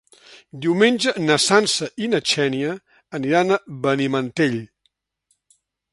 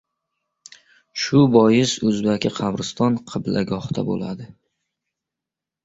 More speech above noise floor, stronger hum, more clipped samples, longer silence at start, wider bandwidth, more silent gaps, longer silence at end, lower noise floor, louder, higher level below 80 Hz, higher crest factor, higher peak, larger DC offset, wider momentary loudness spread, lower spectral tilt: second, 50 dB vs 67 dB; neither; neither; second, 0.3 s vs 1.15 s; first, 11.5 kHz vs 8 kHz; neither; second, 1.25 s vs 1.4 s; second, -69 dBFS vs -87 dBFS; about the same, -20 LUFS vs -20 LUFS; second, -66 dBFS vs -56 dBFS; about the same, 20 dB vs 20 dB; about the same, 0 dBFS vs -2 dBFS; neither; about the same, 11 LU vs 12 LU; second, -4 dB/octave vs -6 dB/octave